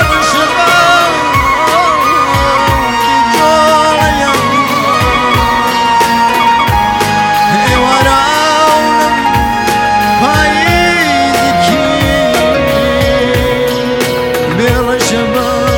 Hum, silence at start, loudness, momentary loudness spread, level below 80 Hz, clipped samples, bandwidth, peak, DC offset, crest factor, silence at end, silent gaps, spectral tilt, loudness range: none; 0 s; -9 LUFS; 3 LU; -26 dBFS; under 0.1%; 17 kHz; 0 dBFS; under 0.1%; 10 dB; 0 s; none; -4 dB/octave; 2 LU